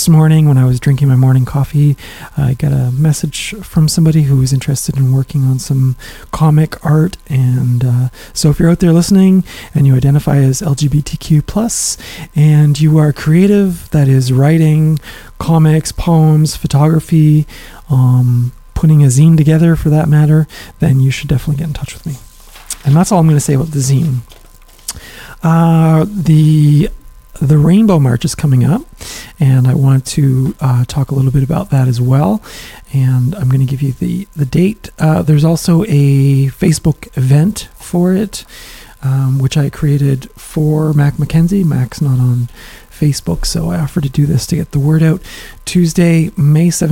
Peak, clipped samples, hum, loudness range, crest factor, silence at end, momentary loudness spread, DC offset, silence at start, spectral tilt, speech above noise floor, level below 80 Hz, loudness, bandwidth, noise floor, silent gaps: 0 dBFS; under 0.1%; none; 4 LU; 10 dB; 0 s; 10 LU; under 0.1%; 0 s; -7 dB/octave; 22 dB; -32 dBFS; -12 LUFS; 16.5 kHz; -33 dBFS; none